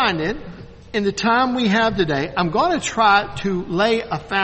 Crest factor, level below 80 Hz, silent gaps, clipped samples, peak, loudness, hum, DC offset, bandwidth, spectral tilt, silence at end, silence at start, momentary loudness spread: 18 dB; -44 dBFS; none; under 0.1%; -2 dBFS; -19 LUFS; none; under 0.1%; 8.4 kHz; -4.5 dB/octave; 0 s; 0 s; 9 LU